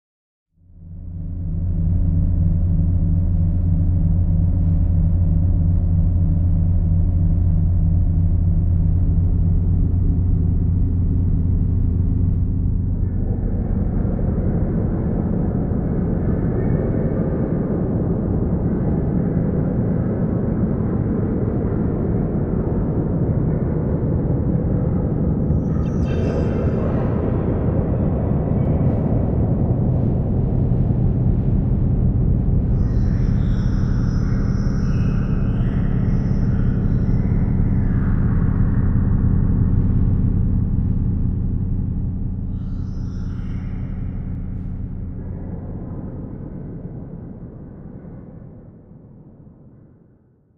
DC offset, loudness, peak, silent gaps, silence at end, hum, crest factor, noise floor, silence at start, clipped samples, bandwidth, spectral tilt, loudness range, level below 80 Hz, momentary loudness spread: under 0.1%; -20 LUFS; -4 dBFS; none; 1.3 s; none; 14 dB; -54 dBFS; 0.8 s; under 0.1%; 5.6 kHz; -11.5 dB/octave; 10 LU; -24 dBFS; 10 LU